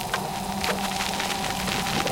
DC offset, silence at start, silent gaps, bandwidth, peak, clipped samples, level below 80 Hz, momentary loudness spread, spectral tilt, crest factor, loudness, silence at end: under 0.1%; 0 s; none; 17 kHz; -8 dBFS; under 0.1%; -46 dBFS; 3 LU; -3 dB/octave; 20 dB; -26 LUFS; 0 s